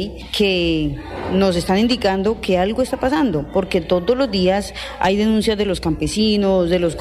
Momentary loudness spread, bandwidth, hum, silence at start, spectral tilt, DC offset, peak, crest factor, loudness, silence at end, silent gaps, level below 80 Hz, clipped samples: 5 LU; 15 kHz; none; 0 s; -5.5 dB/octave; under 0.1%; -6 dBFS; 12 dB; -18 LUFS; 0 s; none; -36 dBFS; under 0.1%